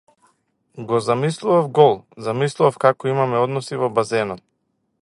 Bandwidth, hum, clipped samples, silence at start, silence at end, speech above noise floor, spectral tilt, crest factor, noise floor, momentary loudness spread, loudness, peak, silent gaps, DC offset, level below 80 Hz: 11.5 kHz; none; under 0.1%; 0.75 s; 0.65 s; 52 dB; -6 dB/octave; 20 dB; -71 dBFS; 11 LU; -19 LUFS; 0 dBFS; none; under 0.1%; -64 dBFS